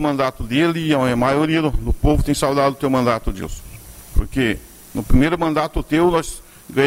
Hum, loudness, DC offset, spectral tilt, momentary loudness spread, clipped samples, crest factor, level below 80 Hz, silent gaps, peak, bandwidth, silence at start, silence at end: none; -19 LUFS; under 0.1%; -6 dB/octave; 14 LU; under 0.1%; 16 dB; -26 dBFS; none; -2 dBFS; 16 kHz; 0 s; 0 s